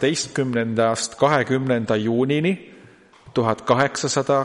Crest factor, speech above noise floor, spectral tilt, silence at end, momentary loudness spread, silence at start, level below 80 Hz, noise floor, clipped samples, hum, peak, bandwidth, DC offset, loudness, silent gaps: 18 dB; 29 dB; -5 dB/octave; 0 s; 4 LU; 0 s; -60 dBFS; -49 dBFS; under 0.1%; none; -2 dBFS; 11.5 kHz; under 0.1%; -21 LUFS; none